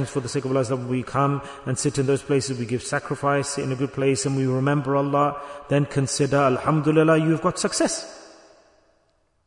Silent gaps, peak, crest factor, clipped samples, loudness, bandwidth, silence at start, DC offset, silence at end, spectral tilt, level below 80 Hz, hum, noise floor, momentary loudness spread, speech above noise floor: none; -6 dBFS; 16 dB; under 0.1%; -23 LUFS; 11 kHz; 0 s; under 0.1%; 1.2 s; -5.5 dB/octave; -56 dBFS; none; -66 dBFS; 7 LU; 43 dB